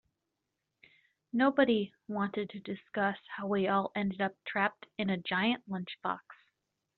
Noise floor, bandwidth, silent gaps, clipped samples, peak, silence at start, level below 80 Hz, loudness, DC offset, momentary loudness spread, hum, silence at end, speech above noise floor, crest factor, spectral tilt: -86 dBFS; 4.5 kHz; none; under 0.1%; -14 dBFS; 1.35 s; -74 dBFS; -33 LUFS; under 0.1%; 10 LU; none; 0.65 s; 53 dB; 20 dB; -3.5 dB/octave